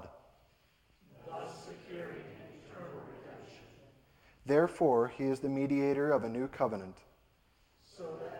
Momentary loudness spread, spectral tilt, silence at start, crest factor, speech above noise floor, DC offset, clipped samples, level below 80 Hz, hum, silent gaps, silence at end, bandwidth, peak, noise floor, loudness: 23 LU; -7.5 dB/octave; 0 s; 22 dB; 38 dB; under 0.1%; under 0.1%; -68 dBFS; none; none; 0 s; 16.5 kHz; -16 dBFS; -69 dBFS; -33 LUFS